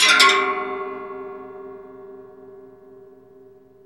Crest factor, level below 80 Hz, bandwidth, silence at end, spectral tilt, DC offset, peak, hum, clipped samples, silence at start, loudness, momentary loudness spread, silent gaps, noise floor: 24 dB; -66 dBFS; 15.5 kHz; 1.2 s; 0.5 dB/octave; under 0.1%; 0 dBFS; none; under 0.1%; 0 s; -18 LUFS; 28 LU; none; -49 dBFS